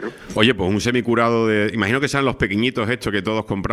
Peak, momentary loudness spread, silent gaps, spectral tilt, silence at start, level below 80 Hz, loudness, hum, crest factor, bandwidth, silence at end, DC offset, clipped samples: 0 dBFS; 5 LU; none; -5.5 dB/octave; 0 s; -44 dBFS; -19 LUFS; none; 20 dB; 14 kHz; 0 s; under 0.1%; under 0.1%